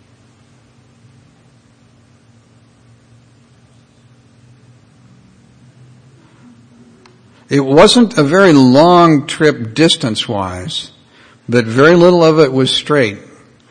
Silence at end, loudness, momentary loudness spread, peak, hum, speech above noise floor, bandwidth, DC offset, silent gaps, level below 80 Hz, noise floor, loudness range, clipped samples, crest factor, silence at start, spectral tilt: 0.5 s; -10 LUFS; 13 LU; 0 dBFS; none; 38 dB; 10 kHz; under 0.1%; none; -50 dBFS; -48 dBFS; 5 LU; 0.4%; 14 dB; 7.5 s; -5.5 dB/octave